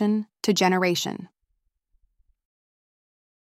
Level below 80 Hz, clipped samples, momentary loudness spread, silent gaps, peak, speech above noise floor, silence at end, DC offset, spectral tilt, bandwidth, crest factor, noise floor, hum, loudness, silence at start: -70 dBFS; under 0.1%; 11 LU; none; -6 dBFS; 51 dB; 2.25 s; under 0.1%; -4.5 dB/octave; 16 kHz; 22 dB; -74 dBFS; none; -23 LUFS; 0 s